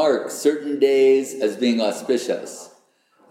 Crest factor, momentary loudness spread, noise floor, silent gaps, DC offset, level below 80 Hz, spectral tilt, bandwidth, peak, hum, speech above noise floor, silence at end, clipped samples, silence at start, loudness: 14 dB; 11 LU; -59 dBFS; none; under 0.1%; -88 dBFS; -3.5 dB/octave; 15.5 kHz; -6 dBFS; none; 39 dB; 0.65 s; under 0.1%; 0 s; -20 LUFS